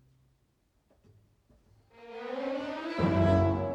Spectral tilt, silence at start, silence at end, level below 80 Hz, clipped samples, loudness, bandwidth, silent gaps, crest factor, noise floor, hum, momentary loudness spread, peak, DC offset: -8.5 dB/octave; 2 s; 0 s; -54 dBFS; under 0.1%; -29 LUFS; 8 kHz; none; 20 dB; -72 dBFS; none; 16 LU; -12 dBFS; under 0.1%